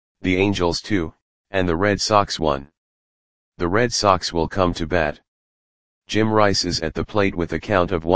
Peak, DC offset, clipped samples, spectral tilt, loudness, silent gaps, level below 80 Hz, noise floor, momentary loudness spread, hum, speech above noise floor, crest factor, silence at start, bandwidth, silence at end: 0 dBFS; 1%; under 0.1%; -4.5 dB/octave; -20 LUFS; 1.22-1.44 s, 2.77-3.52 s, 5.28-6.02 s; -42 dBFS; under -90 dBFS; 8 LU; none; over 70 dB; 20 dB; 0.15 s; 10 kHz; 0 s